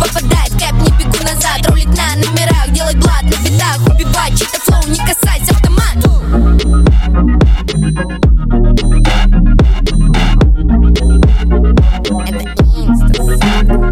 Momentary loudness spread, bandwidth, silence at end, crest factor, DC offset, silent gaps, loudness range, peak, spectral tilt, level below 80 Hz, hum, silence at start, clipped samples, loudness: 3 LU; 16.5 kHz; 0 s; 8 dB; under 0.1%; none; 1 LU; 0 dBFS; -5 dB/octave; -10 dBFS; none; 0 s; under 0.1%; -11 LUFS